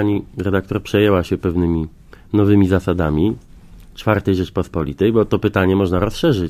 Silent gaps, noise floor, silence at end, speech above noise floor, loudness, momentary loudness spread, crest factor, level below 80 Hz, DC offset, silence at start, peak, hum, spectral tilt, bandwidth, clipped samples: none; -40 dBFS; 0 s; 24 dB; -18 LUFS; 7 LU; 16 dB; -32 dBFS; under 0.1%; 0 s; 0 dBFS; none; -7.5 dB/octave; 15.5 kHz; under 0.1%